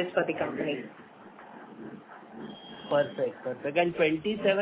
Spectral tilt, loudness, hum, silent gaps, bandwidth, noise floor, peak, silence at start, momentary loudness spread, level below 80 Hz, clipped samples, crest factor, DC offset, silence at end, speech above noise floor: -9 dB/octave; -29 LUFS; none; none; 4 kHz; -49 dBFS; -12 dBFS; 0 s; 21 LU; -68 dBFS; under 0.1%; 20 dB; under 0.1%; 0 s; 20 dB